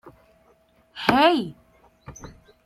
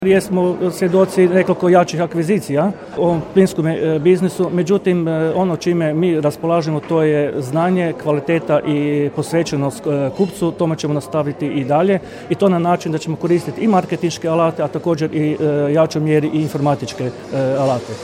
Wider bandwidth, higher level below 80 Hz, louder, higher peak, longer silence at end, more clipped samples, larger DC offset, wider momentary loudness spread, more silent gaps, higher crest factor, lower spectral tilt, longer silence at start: about the same, 16 kHz vs 16.5 kHz; about the same, -54 dBFS vs -54 dBFS; second, -20 LUFS vs -17 LUFS; about the same, -2 dBFS vs 0 dBFS; first, 0.35 s vs 0 s; neither; neither; first, 26 LU vs 6 LU; neither; first, 24 dB vs 16 dB; second, -5 dB/octave vs -7 dB/octave; about the same, 0.05 s vs 0 s